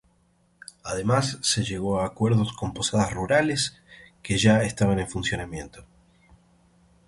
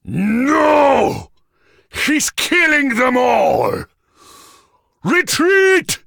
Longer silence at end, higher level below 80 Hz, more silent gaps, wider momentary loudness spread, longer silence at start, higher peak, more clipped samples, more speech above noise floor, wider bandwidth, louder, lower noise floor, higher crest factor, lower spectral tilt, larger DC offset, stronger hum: first, 1.25 s vs 0.1 s; about the same, -48 dBFS vs -48 dBFS; neither; first, 15 LU vs 9 LU; first, 0.85 s vs 0.05 s; second, -6 dBFS vs 0 dBFS; neither; about the same, 40 dB vs 41 dB; second, 11.5 kHz vs 19.5 kHz; second, -24 LUFS vs -14 LUFS; first, -64 dBFS vs -56 dBFS; about the same, 20 dB vs 16 dB; about the same, -4.5 dB/octave vs -3.5 dB/octave; neither; neither